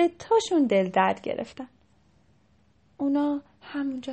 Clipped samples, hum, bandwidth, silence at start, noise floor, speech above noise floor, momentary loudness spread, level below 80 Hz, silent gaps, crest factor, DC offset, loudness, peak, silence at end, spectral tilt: under 0.1%; none; 8.4 kHz; 0 s; -63 dBFS; 38 dB; 15 LU; -66 dBFS; none; 18 dB; under 0.1%; -26 LUFS; -8 dBFS; 0 s; -5.5 dB/octave